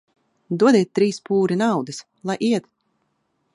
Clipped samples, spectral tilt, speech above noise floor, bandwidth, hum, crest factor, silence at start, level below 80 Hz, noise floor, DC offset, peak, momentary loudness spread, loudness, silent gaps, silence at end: under 0.1%; -6 dB/octave; 51 dB; 11.5 kHz; none; 18 dB; 0.5 s; -70 dBFS; -70 dBFS; under 0.1%; -4 dBFS; 13 LU; -20 LUFS; none; 0.95 s